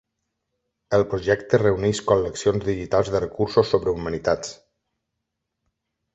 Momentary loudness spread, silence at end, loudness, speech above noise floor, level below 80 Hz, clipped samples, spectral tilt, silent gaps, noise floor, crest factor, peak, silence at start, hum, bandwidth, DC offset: 6 LU; 1.6 s; -22 LUFS; 59 dB; -46 dBFS; under 0.1%; -5.5 dB/octave; none; -80 dBFS; 20 dB; -4 dBFS; 0.9 s; none; 8.2 kHz; under 0.1%